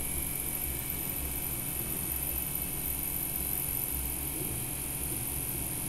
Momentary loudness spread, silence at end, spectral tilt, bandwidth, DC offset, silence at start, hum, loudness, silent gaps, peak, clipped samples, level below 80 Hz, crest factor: 2 LU; 0 s; -3 dB/octave; 16 kHz; under 0.1%; 0 s; none; -32 LUFS; none; -18 dBFS; under 0.1%; -44 dBFS; 16 dB